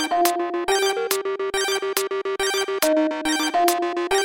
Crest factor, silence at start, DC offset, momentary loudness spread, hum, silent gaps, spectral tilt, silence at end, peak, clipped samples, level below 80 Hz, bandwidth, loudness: 16 dB; 0 s; under 0.1%; 4 LU; none; none; -1 dB/octave; 0 s; -6 dBFS; under 0.1%; -56 dBFS; 19 kHz; -22 LUFS